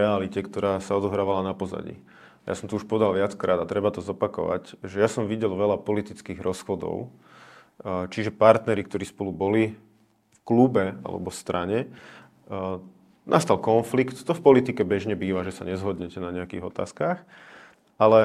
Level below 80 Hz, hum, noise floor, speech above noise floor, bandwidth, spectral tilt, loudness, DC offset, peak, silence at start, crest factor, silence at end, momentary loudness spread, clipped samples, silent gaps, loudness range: -64 dBFS; none; -63 dBFS; 38 dB; 14 kHz; -6.5 dB/octave; -25 LUFS; under 0.1%; 0 dBFS; 0 s; 24 dB; 0 s; 13 LU; under 0.1%; none; 5 LU